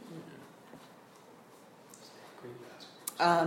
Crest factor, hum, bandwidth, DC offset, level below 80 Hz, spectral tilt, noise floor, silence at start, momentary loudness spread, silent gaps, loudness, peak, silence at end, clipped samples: 24 dB; none; 16.5 kHz; under 0.1%; -80 dBFS; -4 dB/octave; -57 dBFS; 0.05 s; 20 LU; none; -37 LUFS; -14 dBFS; 0 s; under 0.1%